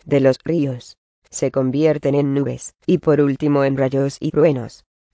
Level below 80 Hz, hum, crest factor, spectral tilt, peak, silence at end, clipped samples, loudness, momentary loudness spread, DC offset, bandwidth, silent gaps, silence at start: -54 dBFS; none; 16 dB; -7 dB/octave; -2 dBFS; 0.4 s; under 0.1%; -18 LUFS; 9 LU; under 0.1%; 8 kHz; 0.98-1.22 s; 0.05 s